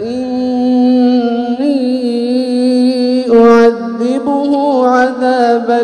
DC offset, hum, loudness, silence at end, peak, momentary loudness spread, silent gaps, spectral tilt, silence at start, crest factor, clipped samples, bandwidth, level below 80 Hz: under 0.1%; none; -11 LUFS; 0 s; 0 dBFS; 7 LU; none; -5.5 dB/octave; 0 s; 10 dB; 0.3%; 9.8 kHz; -52 dBFS